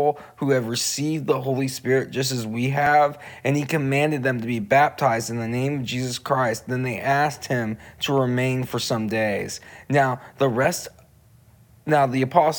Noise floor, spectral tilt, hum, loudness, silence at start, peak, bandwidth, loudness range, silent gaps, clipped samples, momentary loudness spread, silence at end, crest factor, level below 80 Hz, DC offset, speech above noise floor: -53 dBFS; -5 dB/octave; none; -23 LUFS; 0 s; -2 dBFS; over 20 kHz; 3 LU; none; under 0.1%; 7 LU; 0 s; 20 dB; -60 dBFS; under 0.1%; 31 dB